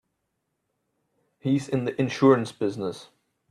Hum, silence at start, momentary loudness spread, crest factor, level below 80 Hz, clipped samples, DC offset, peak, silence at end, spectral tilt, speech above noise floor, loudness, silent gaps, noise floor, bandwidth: none; 1.45 s; 14 LU; 22 dB; -68 dBFS; under 0.1%; under 0.1%; -6 dBFS; 0.45 s; -7 dB/octave; 54 dB; -25 LUFS; none; -78 dBFS; 11 kHz